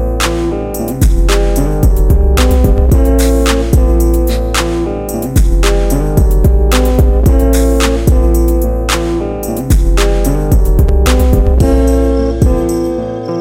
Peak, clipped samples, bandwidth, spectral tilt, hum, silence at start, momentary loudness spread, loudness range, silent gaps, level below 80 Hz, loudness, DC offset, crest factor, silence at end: 0 dBFS; under 0.1%; 16.5 kHz; -6 dB/octave; none; 0 s; 6 LU; 1 LU; none; -10 dBFS; -12 LUFS; under 0.1%; 10 dB; 0 s